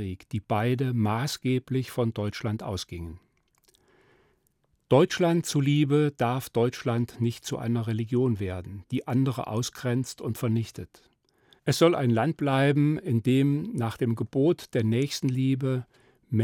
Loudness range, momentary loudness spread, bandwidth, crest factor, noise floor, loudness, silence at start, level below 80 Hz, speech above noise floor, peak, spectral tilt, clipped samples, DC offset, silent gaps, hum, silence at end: 5 LU; 11 LU; 17 kHz; 20 dB; -71 dBFS; -27 LUFS; 0 s; -62 dBFS; 45 dB; -8 dBFS; -6.5 dB/octave; under 0.1%; under 0.1%; none; none; 0 s